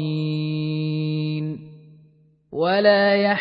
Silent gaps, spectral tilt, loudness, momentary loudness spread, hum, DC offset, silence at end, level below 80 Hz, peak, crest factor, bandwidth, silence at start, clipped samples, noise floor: none; -9.5 dB/octave; -21 LUFS; 14 LU; none; under 0.1%; 0 s; -64 dBFS; -4 dBFS; 18 dB; 5.4 kHz; 0 s; under 0.1%; -56 dBFS